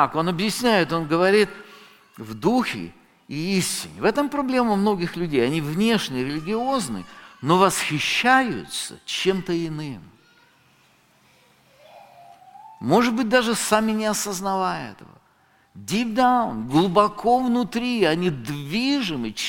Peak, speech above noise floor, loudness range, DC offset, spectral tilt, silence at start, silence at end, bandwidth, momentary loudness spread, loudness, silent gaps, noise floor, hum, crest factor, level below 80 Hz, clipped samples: -2 dBFS; 38 dB; 7 LU; under 0.1%; -4.5 dB/octave; 0 s; 0 s; 17 kHz; 13 LU; -22 LUFS; none; -60 dBFS; none; 20 dB; -54 dBFS; under 0.1%